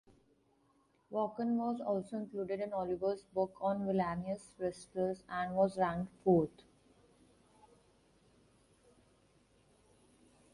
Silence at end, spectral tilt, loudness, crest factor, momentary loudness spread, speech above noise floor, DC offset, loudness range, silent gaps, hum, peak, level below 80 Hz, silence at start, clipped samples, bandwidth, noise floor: 4.05 s; -7.5 dB/octave; -36 LUFS; 22 dB; 9 LU; 37 dB; under 0.1%; 4 LU; none; none; -16 dBFS; -68 dBFS; 1.1 s; under 0.1%; 11.5 kHz; -73 dBFS